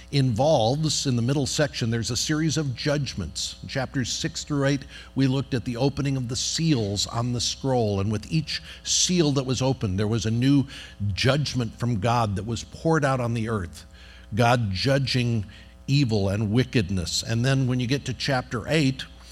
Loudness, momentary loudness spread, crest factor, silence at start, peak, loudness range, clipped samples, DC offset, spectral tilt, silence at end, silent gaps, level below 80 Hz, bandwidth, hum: -24 LUFS; 9 LU; 18 dB; 0 s; -6 dBFS; 3 LU; under 0.1%; under 0.1%; -5 dB/octave; 0 s; none; -48 dBFS; 14 kHz; none